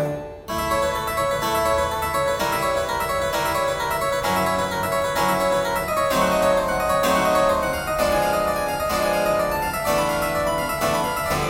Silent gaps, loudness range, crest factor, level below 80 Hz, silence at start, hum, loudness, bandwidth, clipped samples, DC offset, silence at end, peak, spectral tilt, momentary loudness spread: none; 2 LU; 14 dB; -40 dBFS; 0 s; none; -21 LUFS; 16.5 kHz; under 0.1%; under 0.1%; 0 s; -8 dBFS; -4 dB/octave; 4 LU